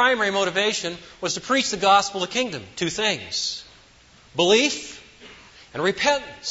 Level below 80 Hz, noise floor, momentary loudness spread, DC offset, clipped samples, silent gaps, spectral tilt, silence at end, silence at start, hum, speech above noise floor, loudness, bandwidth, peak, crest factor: -58 dBFS; -52 dBFS; 14 LU; under 0.1%; under 0.1%; none; -2.5 dB/octave; 0 s; 0 s; none; 30 dB; -22 LUFS; 8 kHz; -6 dBFS; 18 dB